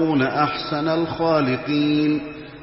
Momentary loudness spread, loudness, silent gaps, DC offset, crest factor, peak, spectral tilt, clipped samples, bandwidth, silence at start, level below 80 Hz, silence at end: 4 LU; -21 LUFS; none; under 0.1%; 16 dB; -6 dBFS; -10 dB/octave; under 0.1%; 5.8 kHz; 0 s; -52 dBFS; 0 s